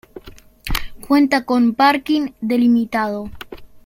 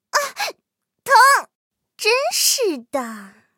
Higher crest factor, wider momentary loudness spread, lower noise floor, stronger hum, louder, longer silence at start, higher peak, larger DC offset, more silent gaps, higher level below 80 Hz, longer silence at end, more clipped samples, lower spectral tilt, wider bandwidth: about the same, 18 dB vs 18 dB; about the same, 18 LU vs 17 LU; second, -39 dBFS vs -75 dBFS; neither; about the same, -17 LUFS vs -17 LUFS; about the same, 0.15 s vs 0.15 s; about the same, -2 dBFS vs 0 dBFS; neither; second, none vs 1.55-1.71 s; first, -36 dBFS vs -80 dBFS; second, 0.05 s vs 0.3 s; neither; first, -5 dB/octave vs 0.5 dB/octave; about the same, 16.5 kHz vs 17 kHz